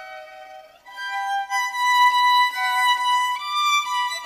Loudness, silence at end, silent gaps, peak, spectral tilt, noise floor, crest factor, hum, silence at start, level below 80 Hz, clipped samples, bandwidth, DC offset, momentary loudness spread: -19 LUFS; 0 s; none; -8 dBFS; 4.5 dB/octave; -43 dBFS; 14 dB; none; 0 s; -72 dBFS; under 0.1%; 15.5 kHz; under 0.1%; 15 LU